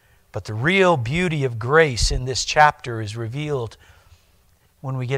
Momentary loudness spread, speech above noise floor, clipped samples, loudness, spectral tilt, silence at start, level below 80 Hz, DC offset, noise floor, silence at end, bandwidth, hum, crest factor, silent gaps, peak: 15 LU; 38 dB; under 0.1%; -20 LUFS; -4.5 dB/octave; 0.35 s; -36 dBFS; under 0.1%; -58 dBFS; 0 s; 15 kHz; none; 20 dB; none; -2 dBFS